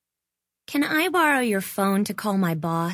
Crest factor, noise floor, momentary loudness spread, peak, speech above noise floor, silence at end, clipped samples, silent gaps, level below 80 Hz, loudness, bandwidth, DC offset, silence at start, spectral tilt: 16 dB; -86 dBFS; 6 LU; -8 dBFS; 63 dB; 0 s; under 0.1%; none; -68 dBFS; -23 LUFS; 16 kHz; under 0.1%; 0.7 s; -5 dB/octave